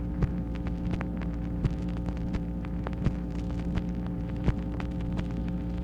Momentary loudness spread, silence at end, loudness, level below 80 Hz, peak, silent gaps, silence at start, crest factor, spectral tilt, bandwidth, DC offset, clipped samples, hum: 3 LU; 0 s; -33 LUFS; -36 dBFS; -12 dBFS; none; 0 s; 18 dB; -9 dB/octave; 7.6 kHz; under 0.1%; under 0.1%; none